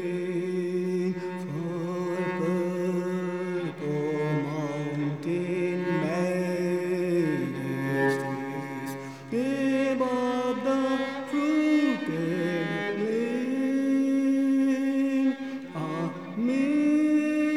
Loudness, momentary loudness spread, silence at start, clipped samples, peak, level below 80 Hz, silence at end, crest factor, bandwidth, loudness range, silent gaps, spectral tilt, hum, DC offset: -27 LUFS; 8 LU; 0 s; under 0.1%; -14 dBFS; -76 dBFS; 0 s; 12 dB; 14 kHz; 3 LU; none; -7 dB/octave; none; 0.1%